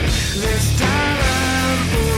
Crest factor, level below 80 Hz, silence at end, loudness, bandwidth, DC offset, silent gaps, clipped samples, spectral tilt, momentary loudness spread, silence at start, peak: 14 dB; -24 dBFS; 0 s; -17 LUFS; 16.5 kHz; under 0.1%; none; under 0.1%; -4 dB/octave; 2 LU; 0 s; -4 dBFS